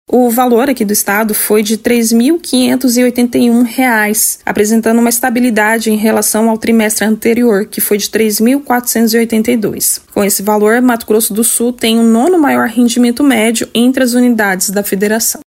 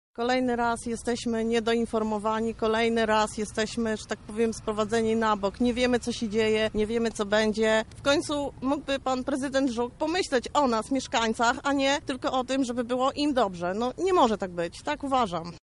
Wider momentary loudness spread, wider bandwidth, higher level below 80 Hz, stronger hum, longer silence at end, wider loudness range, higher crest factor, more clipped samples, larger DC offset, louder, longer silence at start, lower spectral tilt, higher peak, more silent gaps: second, 3 LU vs 6 LU; first, 16.5 kHz vs 11.5 kHz; about the same, -50 dBFS vs -50 dBFS; neither; about the same, 0.05 s vs 0.05 s; about the same, 1 LU vs 1 LU; second, 10 dB vs 18 dB; neither; neither; first, -10 LUFS vs -27 LUFS; about the same, 0.1 s vs 0.2 s; about the same, -3.5 dB/octave vs -4 dB/octave; first, 0 dBFS vs -8 dBFS; neither